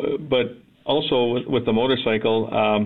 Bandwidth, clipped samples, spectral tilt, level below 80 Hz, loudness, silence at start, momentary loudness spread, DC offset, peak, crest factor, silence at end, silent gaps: 4.3 kHz; under 0.1%; -8.5 dB/octave; -54 dBFS; -21 LUFS; 0 s; 4 LU; under 0.1%; -8 dBFS; 12 dB; 0 s; none